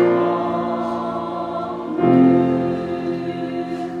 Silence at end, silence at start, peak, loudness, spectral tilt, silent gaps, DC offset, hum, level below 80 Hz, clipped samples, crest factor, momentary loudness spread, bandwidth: 0 s; 0 s; -2 dBFS; -20 LUFS; -8.5 dB/octave; none; under 0.1%; none; -58 dBFS; under 0.1%; 18 dB; 11 LU; 6.8 kHz